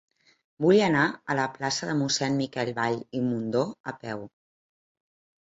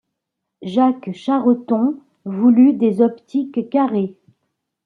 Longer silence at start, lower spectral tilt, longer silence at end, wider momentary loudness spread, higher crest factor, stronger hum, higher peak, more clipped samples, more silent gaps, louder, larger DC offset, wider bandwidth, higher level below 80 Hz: about the same, 0.6 s vs 0.6 s; second, -4.5 dB/octave vs -9 dB/octave; first, 1.15 s vs 0.75 s; about the same, 14 LU vs 13 LU; first, 20 dB vs 14 dB; neither; second, -8 dBFS vs -4 dBFS; neither; first, 3.80-3.84 s vs none; second, -26 LUFS vs -17 LUFS; neither; first, 8 kHz vs 4.7 kHz; about the same, -66 dBFS vs -70 dBFS